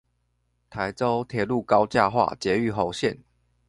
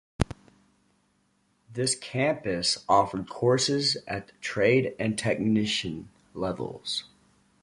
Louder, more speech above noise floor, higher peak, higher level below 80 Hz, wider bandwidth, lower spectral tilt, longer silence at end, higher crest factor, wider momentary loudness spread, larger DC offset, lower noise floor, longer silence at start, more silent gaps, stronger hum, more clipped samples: first, -24 LUFS vs -27 LUFS; first, 48 dB vs 43 dB; about the same, -4 dBFS vs -6 dBFS; about the same, -54 dBFS vs -50 dBFS; about the same, 11.5 kHz vs 11.5 kHz; first, -6 dB/octave vs -4 dB/octave; about the same, 0.55 s vs 0.55 s; about the same, 22 dB vs 22 dB; about the same, 10 LU vs 11 LU; neither; about the same, -71 dBFS vs -69 dBFS; first, 0.75 s vs 0.2 s; neither; neither; neither